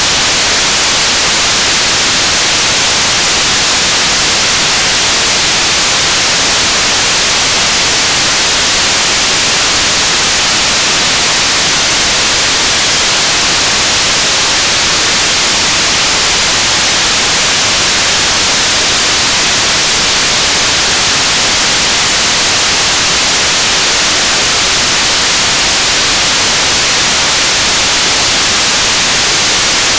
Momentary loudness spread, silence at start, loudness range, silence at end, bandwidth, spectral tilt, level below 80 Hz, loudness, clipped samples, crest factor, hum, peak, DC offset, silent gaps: 0 LU; 0 s; 0 LU; 0 s; 8 kHz; 0 dB/octave; -32 dBFS; -7 LUFS; under 0.1%; 10 dB; none; 0 dBFS; 0.4%; none